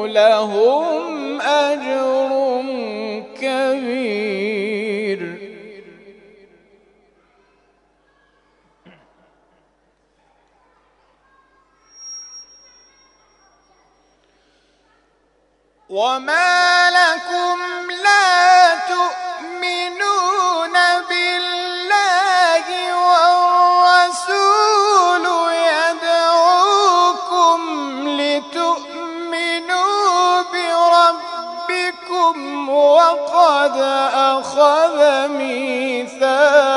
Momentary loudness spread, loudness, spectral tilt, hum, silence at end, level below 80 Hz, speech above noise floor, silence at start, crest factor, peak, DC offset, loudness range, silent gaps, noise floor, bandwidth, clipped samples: 12 LU; -15 LUFS; -2 dB/octave; none; 0 s; -68 dBFS; 45 dB; 0 s; 16 dB; 0 dBFS; under 0.1%; 9 LU; none; -61 dBFS; 11 kHz; under 0.1%